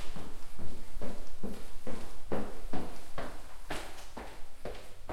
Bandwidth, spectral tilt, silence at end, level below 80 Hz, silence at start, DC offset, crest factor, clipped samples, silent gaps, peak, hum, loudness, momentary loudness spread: 13.5 kHz; -5 dB/octave; 0 s; -44 dBFS; 0 s; under 0.1%; 10 dB; under 0.1%; none; -16 dBFS; none; -45 LUFS; 8 LU